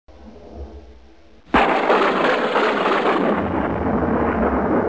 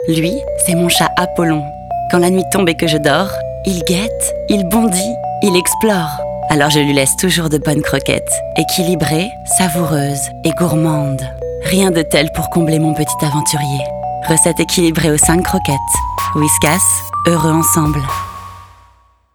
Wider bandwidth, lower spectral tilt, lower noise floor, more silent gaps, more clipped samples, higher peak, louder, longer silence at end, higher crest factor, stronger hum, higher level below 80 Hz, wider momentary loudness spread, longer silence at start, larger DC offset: second, 8 kHz vs over 20 kHz; first, -6.5 dB/octave vs -4 dB/octave; about the same, -49 dBFS vs -50 dBFS; neither; neither; second, -6 dBFS vs 0 dBFS; second, -18 LUFS vs -14 LUFS; second, 0 s vs 0.7 s; about the same, 14 dB vs 14 dB; neither; about the same, -38 dBFS vs -34 dBFS; first, 12 LU vs 8 LU; first, 0.2 s vs 0 s; first, 0.4% vs under 0.1%